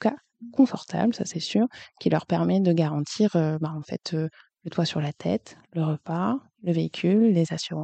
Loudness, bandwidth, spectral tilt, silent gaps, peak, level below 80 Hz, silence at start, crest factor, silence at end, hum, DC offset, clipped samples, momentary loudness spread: -26 LUFS; 8.8 kHz; -6.5 dB/octave; none; -8 dBFS; -68 dBFS; 0 s; 18 dB; 0 s; none; under 0.1%; under 0.1%; 9 LU